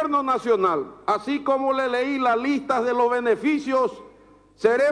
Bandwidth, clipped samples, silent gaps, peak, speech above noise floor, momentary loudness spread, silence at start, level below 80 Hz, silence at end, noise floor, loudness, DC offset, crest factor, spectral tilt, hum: 10.5 kHz; under 0.1%; none; -6 dBFS; 30 dB; 4 LU; 0 s; -62 dBFS; 0 s; -52 dBFS; -22 LUFS; under 0.1%; 16 dB; -5 dB/octave; none